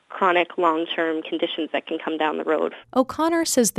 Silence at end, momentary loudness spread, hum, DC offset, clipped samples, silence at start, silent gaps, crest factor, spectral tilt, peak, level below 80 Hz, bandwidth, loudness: 0 s; 7 LU; none; under 0.1%; under 0.1%; 0.1 s; none; 18 dB; -2.5 dB/octave; -4 dBFS; -64 dBFS; 15.5 kHz; -23 LUFS